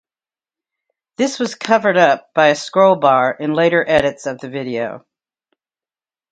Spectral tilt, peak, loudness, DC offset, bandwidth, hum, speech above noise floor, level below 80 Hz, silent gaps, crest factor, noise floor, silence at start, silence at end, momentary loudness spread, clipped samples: -4.5 dB/octave; 0 dBFS; -15 LUFS; under 0.1%; 9.2 kHz; none; over 75 dB; -54 dBFS; none; 18 dB; under -90 dBFS; 1.2 s; 1.35 s; 12 LU; under 0.1%